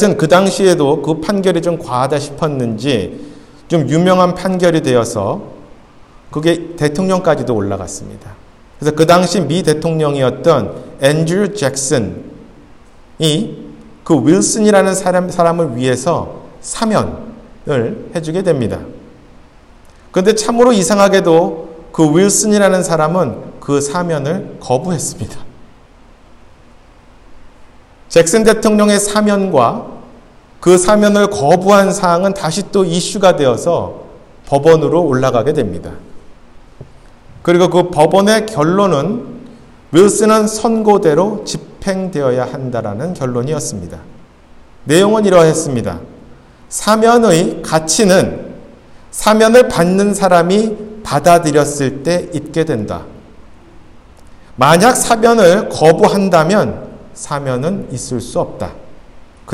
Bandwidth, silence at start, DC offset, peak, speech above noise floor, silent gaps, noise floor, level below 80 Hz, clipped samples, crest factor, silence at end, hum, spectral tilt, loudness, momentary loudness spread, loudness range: 16 kHz; 0 s; under 0.1%; 0 dBFS; 30 dB; none; -42 dBFS; -42 dBFS; 0.1%; 14 dB; 0 s; none; -5 dB/octave; -12 LUFS; 15 LU; 7 LU